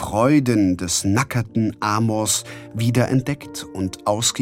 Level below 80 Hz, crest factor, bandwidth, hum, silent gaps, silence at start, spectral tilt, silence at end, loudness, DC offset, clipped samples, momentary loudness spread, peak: -50 dBFS; 16 dB; 16.5 kHz; none; none; 0 s; -4.5 dB/octave; 0 s; -20 LUFS; under 0.1%; under 0.1%; 11 LU; -4 dBFS